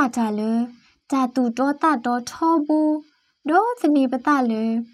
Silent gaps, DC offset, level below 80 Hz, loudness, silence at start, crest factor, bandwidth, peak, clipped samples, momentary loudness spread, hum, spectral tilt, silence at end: none; under 0.1%; -70 dBFS; -21 LUFS; 0 s; 16 dB; 13 kHz; -6 dBFS; under 0.1%; 6 LU; none; -5.5 dB/octave; 0.1 s